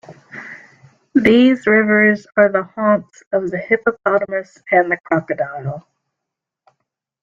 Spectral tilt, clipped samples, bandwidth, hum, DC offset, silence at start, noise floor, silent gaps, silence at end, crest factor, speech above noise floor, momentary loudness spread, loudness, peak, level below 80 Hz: -7 dB/octave; under 0.1%; 7.4 kHz; none; under 0.1%; 0.1 s; -82 dBFS; 3.27-3.31 s, 5.00-5.04 s; 1.4 s; 16 dB; 66 dB; 19 LU; -16 LUFS; -2 dBFS; -58 dBFS